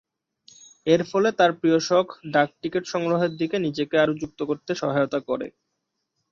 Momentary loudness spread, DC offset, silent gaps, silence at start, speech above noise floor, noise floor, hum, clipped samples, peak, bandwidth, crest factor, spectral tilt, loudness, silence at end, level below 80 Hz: 10 LU; under 0.1%; none; 0.85 s; 56 dB; -79 dBFS; none; under 0.1%; -6 dBFS; 7.4 kHz; 18 dB; -5.5 dB/octave; -23 LUFS; 0.8 s; -64 dBFS